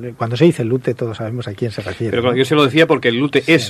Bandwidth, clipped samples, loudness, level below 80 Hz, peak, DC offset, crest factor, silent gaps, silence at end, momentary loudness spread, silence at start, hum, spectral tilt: 14 kHz; under 0.1%; -16 LUFS; -54 dBFS; 0 dBFS; under 0.1%; 16 dB; none; 0 s; 11 LU; 0 s; none; -6 dB/octave